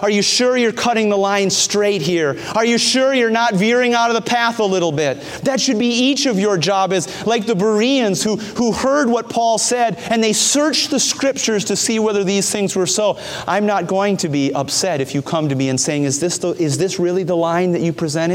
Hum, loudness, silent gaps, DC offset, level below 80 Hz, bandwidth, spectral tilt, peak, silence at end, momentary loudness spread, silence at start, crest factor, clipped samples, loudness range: none; -16 LUFS; none; under 0.1%; -56 dBFS; 16.5 kHz; -3.5 dB/octave; -2 dBFS; 0 s; 5 LU; 0 s; 14 dB; under 0.1%; 3 LU